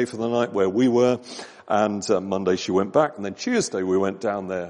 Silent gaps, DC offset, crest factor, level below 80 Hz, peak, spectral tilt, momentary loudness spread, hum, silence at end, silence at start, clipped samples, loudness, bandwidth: none; under 0.1%; 18 dB; -66 dBFS; -4 dBFS; -5 dB/octave; 8 LU; none; 0 s; 0 s; under 0.1%; -23 LUFS; 10.5 kHz